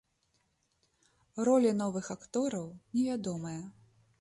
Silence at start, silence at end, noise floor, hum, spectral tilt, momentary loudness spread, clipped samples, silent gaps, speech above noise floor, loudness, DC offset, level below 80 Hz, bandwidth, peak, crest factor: 1.35 s; 0.5 s; -76 dBFS; none; -6 dB/octave; 16 LU; under 0.1%; none; 44 dB; -32 LUFS; under 0.1%; -72 dBFS; 11.5 kHz; -16 dBFS; 18 dB